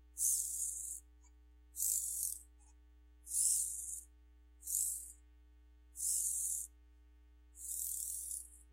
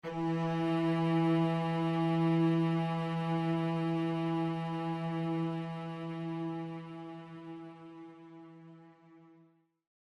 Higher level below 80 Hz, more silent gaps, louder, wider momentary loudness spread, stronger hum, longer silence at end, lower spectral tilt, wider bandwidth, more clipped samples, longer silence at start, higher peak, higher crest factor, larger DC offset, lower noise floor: first, -64 dBFS vs -74 dBFS; neither; second, -37 LUFS vs -33 LUFS; second, 16 LU vs 20 LU; neither; second, 0 s vs 0.85 s; second, 1 dB/octave vs -8.5 dB/octave; first, 16 kHz vs 6.2 kHz; neither; about the same, 0 s vs 0.05 s; first, -16 dBFS vs -20 dBFS; first, 26 dB vs 14 dB; neither; about the same, -63 dBFS vs -66 dBFS